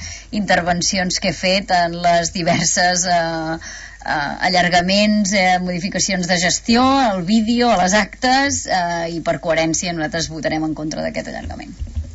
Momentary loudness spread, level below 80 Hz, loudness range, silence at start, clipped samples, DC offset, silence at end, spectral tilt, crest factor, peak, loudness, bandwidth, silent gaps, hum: 10 LU; -38 dBFS; 4 LU; 0 s; under 0.1%; under 0.1%; 0 s; -3.5 dB/octave; 14 dB; -4 dBFS; -17 LUFS; 8.2 kHz; none; none